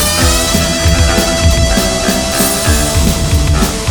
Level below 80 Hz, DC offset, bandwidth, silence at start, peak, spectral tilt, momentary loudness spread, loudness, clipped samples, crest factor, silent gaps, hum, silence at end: -16 dBFS; under 0.1%; over 20 kHz; 0 s; 0 dBFS; -3.5 dB/octave; 2 LU; -11 LUFS; under 0.1%; 10 dB; none; none; 0 s